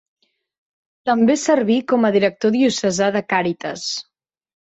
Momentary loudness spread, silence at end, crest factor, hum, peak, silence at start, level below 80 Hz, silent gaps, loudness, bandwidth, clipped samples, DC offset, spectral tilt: 9 LU; 0.75 s; 16 dB; none; -4 dBFS; 1.05 s; -62 dBFS; none; -18 LUFS; 8.2 kHz; under 0.1%; under 0.1%; -4.5 dB/octave